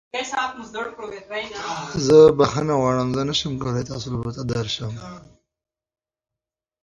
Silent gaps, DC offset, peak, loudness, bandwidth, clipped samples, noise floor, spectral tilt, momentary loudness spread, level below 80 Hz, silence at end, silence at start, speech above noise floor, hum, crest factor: none; under 0.1%; -2 dBFS; -21 LUFS; 7.8 kHz; under 0.1%; -88 dBFS; -5.5 dB/octave; 18 LU; -50 dBFS; 1.65 s; 0.15 s; 67 dB; none; 20 dB